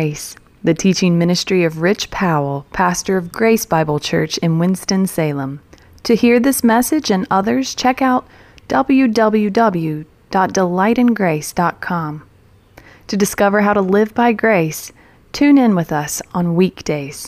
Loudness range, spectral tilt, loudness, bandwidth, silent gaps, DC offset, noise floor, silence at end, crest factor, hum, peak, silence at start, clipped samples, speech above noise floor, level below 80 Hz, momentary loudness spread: 2 LU; -5.5 dB/octave; -16 LUFS; 15.5 kHz; none; under 0.1%; -46 dBFS; 0 s; 12 dB; none; -2 dBFS; 0 s; under 0.1%; 31 dB; -46 dBFS; 9 LU